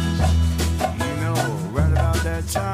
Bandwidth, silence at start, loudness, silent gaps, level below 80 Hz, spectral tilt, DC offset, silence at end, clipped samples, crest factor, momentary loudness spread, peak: 16 kHz; 0 s; -22 LUFS; none; -26 dBFS; -5.5 dB/octave; under 0.1%; 0 s; under 0.1%; 12 dB; 4 LU; -8 dBFS